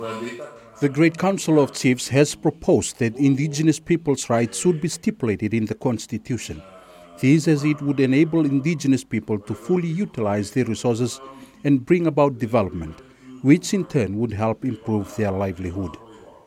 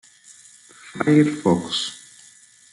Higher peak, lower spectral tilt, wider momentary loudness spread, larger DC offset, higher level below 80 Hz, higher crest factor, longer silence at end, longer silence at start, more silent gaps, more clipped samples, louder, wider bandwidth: about the same, -2 dBFS vs -4 dBFS; about the same, -6 dB/octave vs -5.5 dB/octave; second, 11 LU vs 20 LU; neither; first, -52 dBFS vs -66 dBFS; about the same, 18 dB vs 20 dB; second, 0.3 s vs 0.75 s; second, 0 s vs 0.85 s; neither; neither; about the same, -21 LUFS vs -20 LUFS; first, 15.5 kHz vs 11.5 kHz